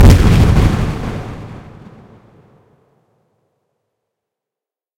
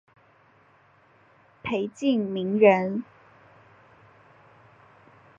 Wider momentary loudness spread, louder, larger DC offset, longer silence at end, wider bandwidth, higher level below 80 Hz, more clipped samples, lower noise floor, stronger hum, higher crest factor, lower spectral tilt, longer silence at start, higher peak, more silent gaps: first, 23 LU vs 16 LU; first, -13 LUFS vs -24 LUFS; neither; first, 3.4 s vs 2.35 s; first, 16.5 kHz vs 7.6 kHz; first, -20 dBFS vs -68 dBFS; neither; first, -88 dBFS vs -59 dBFS; neither; second, 14 dB vs 24 dB; about the same, -7 dB/octave vs -7 dB/octave; second, 0 s vs 1.65 s; first, 0 dBFS vs -4 dBFS; neither